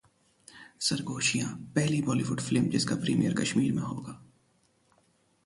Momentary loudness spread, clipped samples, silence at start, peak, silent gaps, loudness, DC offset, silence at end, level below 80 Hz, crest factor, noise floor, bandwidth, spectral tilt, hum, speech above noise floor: 14 LU; under 0.1%; 0.55 s; -12 dBFS; none; -29 LUFS; under 0.1%; 1.2 s; -64 dBFS; 18 dB; -69 dBFS; 11.5 kHz; -4.5 dB/octave; none; 40 dB